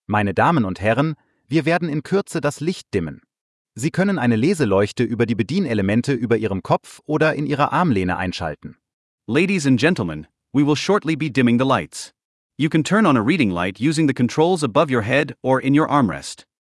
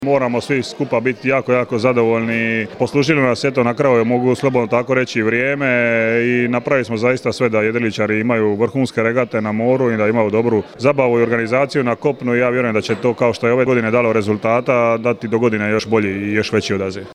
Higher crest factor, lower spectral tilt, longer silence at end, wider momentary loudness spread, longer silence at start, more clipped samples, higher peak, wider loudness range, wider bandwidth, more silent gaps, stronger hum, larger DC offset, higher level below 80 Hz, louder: about the same, 16 dB vs 16 dB; about the same, -6 dB/octave vs -6.5 dB/octave; first, 0.4 s vs 0 s; first, 9 LU vs 4 LU; about the same, 0.1 s vs 0 s; neither; second, -4 dBFS vs 0 dBFS; about the same, 3 LU vs 1 LU; about the same, 12 kHz vs 11.5 kHz; first, 3.41-3.65 s, 8.93-9.18 s, 12.24-12.50 s vs none; neither; neither; about the same, -54 dBFS vs -56 dBFS; second, -19 LUFS vs -16 LUFS